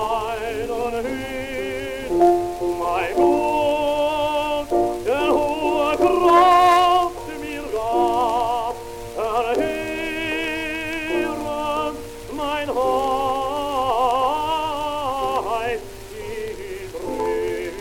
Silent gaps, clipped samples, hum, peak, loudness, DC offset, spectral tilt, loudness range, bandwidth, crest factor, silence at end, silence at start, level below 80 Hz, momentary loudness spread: none; under 0.1%; none; -4 dBFS; -21 LUFS; under 0.1%; -4.5 dB/octave; 7 LU; 17 kHz; 18 dB; 0 s; 0 s; -42 dBFS; 12 LU